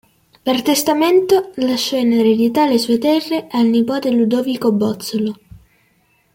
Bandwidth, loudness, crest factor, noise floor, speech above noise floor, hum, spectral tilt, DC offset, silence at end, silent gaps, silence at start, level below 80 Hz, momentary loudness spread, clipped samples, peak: 17 kHz; -16 LUFS; 14 dB; -59 dBFS; 44 dB; none; -4.5 dB/octave; under 0.1%; 0.75 s; none; 0.45 s; -58 dBFS; 7 LU; under 0.1%; -2 dBFS